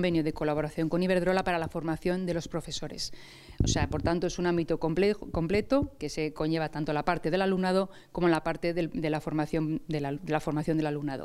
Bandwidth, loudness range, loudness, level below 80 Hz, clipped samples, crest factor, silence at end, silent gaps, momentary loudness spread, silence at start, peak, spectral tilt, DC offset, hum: 14.5 kHz; 2 LU; -30 LUFS; -46 dBFS; under 0.1%; 18 dB; 0 s; none; 7 LU; 0 s; -10 dBFS; -6 dB/octave; under 0.1%; none